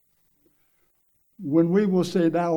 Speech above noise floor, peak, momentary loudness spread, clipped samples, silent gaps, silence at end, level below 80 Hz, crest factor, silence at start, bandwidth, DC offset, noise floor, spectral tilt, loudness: 46 dB; -8 dBFS; 4 LU; under 0.1%; none; 0 s; -72 dBFS; 16 dB; 1.4 s; 18.5 kHz; under 0.1%; -67 dBFS; -7.5 dB/octave; -22 LUFS